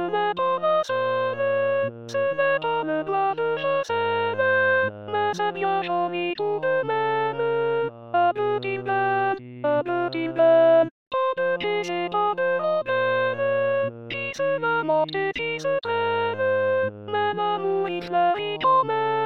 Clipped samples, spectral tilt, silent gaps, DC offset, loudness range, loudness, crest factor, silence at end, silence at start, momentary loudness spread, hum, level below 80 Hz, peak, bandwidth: under 0.1%; -5.5 dB/octave; 10.91-11.11 s; 0.2%; 2 LU; -23 LUFS; 14 dB; 0 s; 0 s; 6 LU; none; -66 dBFS; -8 dBFS; 7.6 kHz